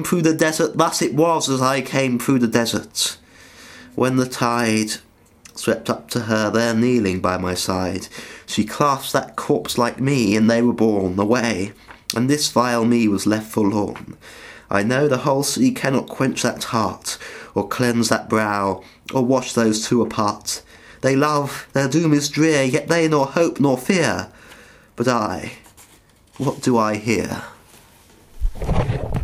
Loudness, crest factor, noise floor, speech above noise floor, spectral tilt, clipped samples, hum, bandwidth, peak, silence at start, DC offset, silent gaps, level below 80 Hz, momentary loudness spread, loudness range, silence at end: -19 LUFS; 20 dB; -52 dBFS; 33 dB; -4.5 dB/octave; under 0.1%; none; 16 kHz; 0 dBFS; 0 s; under 0.1%; none; -40 dBFS; 11 LU; 4 LU; 0 s